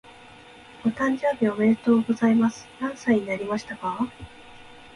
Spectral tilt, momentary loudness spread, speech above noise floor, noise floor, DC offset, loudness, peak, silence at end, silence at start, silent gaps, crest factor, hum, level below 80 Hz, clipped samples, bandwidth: -6.5 dB/octave; 11 LU; 24 dB; -47 dBFS; under 0.1%; -24 LUFS; -8 dBFS; 0.1 s; 0.8 s; none; 16 dB; none; -58 dBFS; under 0.1%; 11 kHz